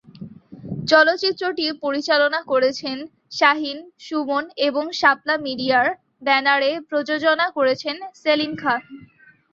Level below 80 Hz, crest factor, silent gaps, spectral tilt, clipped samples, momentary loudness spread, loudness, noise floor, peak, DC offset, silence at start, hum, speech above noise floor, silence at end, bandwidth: -66 dBFS; 20 dB; none; -4 dB/octave; under 0.1%; 13 LU; -20 LUFS; -51 dBFS; -2 dBFS; under 0.1%; 0.2 s; none; 31 dB; 0.45 s; 7.6 kHz